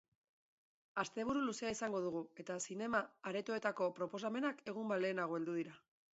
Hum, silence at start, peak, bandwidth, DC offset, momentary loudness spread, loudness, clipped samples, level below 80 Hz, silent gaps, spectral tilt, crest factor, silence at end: none; 0.95 s; -22 dBFS; 8 kHz; under 0.1%; 6 LU; -41 LUFS; under 0.1%; -78 dBFS; none; -4 dB/octave; 20 dB; 0.35 s